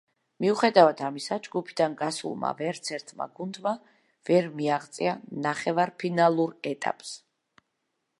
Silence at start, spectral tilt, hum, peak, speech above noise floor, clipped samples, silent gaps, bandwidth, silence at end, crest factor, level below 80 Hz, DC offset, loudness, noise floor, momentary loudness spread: 0.4 s; -5 dB/octave; none; -4 dBFS; 53 dB; under 0.1%; none; 11.5 kHz; 1.05 s; 24 dB; -78 dBFS; under 0.1%; -27 LUFS; -79 dBFS; 14 LU